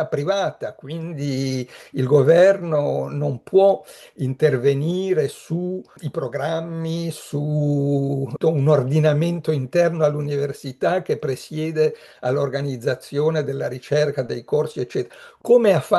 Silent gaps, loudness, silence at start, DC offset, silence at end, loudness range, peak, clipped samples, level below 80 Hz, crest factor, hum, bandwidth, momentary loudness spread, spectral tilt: none; -21 LUFS; 0 s; under 0.1%; 0 s; 5 LU; -2 dBFS; under 0.1%; -66 dBFS; 18 dB; none; 12.5 kHz; 11 LU; -7 dB/octave